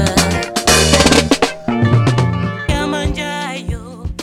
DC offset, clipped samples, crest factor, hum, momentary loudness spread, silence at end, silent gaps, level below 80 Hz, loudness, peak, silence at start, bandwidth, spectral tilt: under 0.1%; under 0.1%; 14 dB; none; 13 LU; 0 s; none; -26 dBFS; -14 LUFS; 0 dBFS; 0 s; 16 kHz; -4 dB/octave